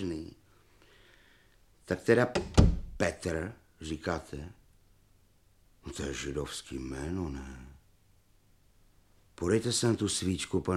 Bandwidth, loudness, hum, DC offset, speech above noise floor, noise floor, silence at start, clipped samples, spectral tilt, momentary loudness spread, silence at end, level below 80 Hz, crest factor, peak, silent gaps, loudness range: 14.5 kHz; -32 LUFS; none; under 0.1%; 35 dB; -66 dBFS; 0 s; under 0.1%; -5 dB/octave; 19 LU; 0 s; -42 dBFS; 26 dB; -6 dBFS; none; 9 LU